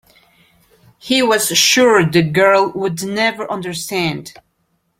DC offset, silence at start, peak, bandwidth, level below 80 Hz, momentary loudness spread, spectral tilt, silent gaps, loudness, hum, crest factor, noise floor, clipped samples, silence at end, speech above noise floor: under 0.1%; 1.05 s; 0 dBFS; 16.5 kHz; -56 dBFS; 12 LU; -3.5 dB/octave; none; -14 LUFS; none; 16 dB; -65 dBFS; under 0.1%; 0.7 s; 51 dB